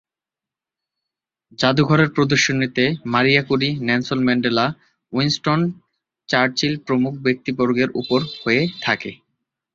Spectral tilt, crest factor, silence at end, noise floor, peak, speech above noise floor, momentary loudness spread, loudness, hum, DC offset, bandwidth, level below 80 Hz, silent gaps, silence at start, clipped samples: -5 dB/octave; 18 dB; 0.6 s; -89 dBFS; -2 dBFS; 70 dB; 6 LU; -19 LUFS; none; under 0.1%; 7.6 kHz; -56 dBFS; none; 1.6 s; under 0.1%